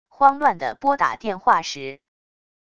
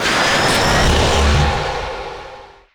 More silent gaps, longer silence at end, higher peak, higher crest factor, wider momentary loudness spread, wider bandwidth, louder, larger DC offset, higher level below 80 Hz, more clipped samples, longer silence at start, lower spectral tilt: neither; first, 0.8 s vs 0.25 s; first, 0 dBFS vs -6 dBFS; first, 22 dB vs 10 dB; about the same, 14 LU vs 16 LU; second, 7.8 kHz vs over 20 kHz; second, -20 LUFS vs -15 LUFS; first, 0.4% vs under 0.1%; second, -62 dBFS vs -22 dBFS; neither; first, 0.2 s vs 0 s; about the same, -3.5 dB/octave vs -4 dB/octave